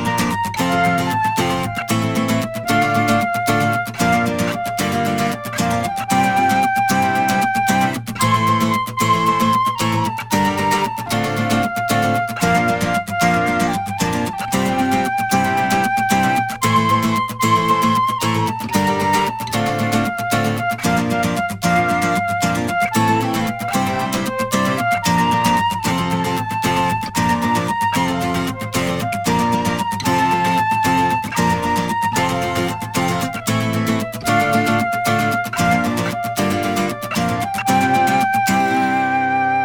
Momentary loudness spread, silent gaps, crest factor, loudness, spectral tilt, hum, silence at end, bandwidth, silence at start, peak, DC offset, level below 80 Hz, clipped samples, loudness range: 5 LU; none; 16 dB; -18 LUFS; -4.5 dB/octave; none; 0 s; over 20 kHz; 0 s; -2 dBFS; under 0.1%; -44 dBFS; under 0.1%; 2 LU